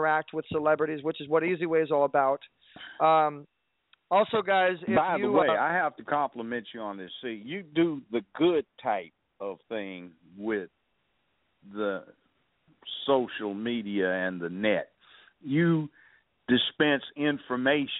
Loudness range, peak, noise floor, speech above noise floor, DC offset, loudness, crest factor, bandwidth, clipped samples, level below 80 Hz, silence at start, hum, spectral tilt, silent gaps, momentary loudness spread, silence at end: 10 LU; -10 dBFS; -75 dBFS; 47 dB; under 0.1%; -28 LUFS; 18 dB; 4 kHz; under 0.1%; -70 dBFS; 0 s; none; -3.5 dB/octave; none; 15 LU; 0 s